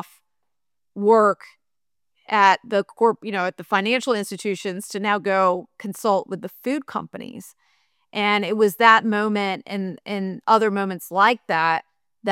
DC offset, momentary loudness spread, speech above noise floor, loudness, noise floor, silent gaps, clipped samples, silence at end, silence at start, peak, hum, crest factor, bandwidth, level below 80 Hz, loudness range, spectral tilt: under 0.1%; 14 LU; 66 dB; -21 LUFS; -87 dBFS; none; under 0.1%; 0 s; 0.95 s; 0 dBFS; none; 20 dB; 16.5 kHz; -76 dBFS; 5 LU; -4.5 dB/octave